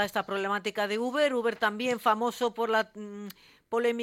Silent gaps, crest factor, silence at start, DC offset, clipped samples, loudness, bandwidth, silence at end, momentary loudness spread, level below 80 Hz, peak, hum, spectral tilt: none; 18 dB; 0 s; under 0.1%; under 0.1%; -29 LUFS; 16.5 kHz; 0 s; 12 LU; -74 dBFS; -12 dBFS; none; -4 dB/octave